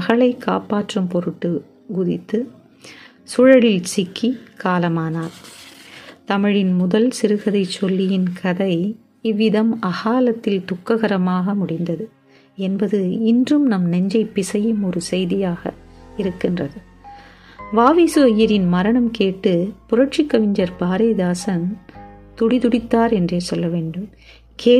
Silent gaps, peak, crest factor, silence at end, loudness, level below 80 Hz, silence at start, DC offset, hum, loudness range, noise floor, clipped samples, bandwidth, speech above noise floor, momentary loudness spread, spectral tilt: none; 0 dBFS; 18 dB; 0 s; -18 LUFS; -50 dBFS; 0 s; under 0.1%; none; 4 LU; -43 dBFS; under 0.1%; 13 kHz; 25 dB; 12 LU; -6.5 dB/octave